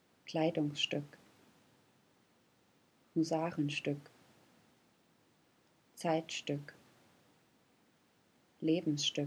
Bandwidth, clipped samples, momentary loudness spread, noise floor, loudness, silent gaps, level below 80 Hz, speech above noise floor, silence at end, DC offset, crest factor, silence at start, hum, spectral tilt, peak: 12.5 kHz; under 0.1%; 8 LU; -71 dBFS; -37 LUFS; none; -86 dBFS; 36 dB; 0 s; under 0.1%; 20 dB; 0.25 s; none; -4.5 dB/octave; -20 dBFS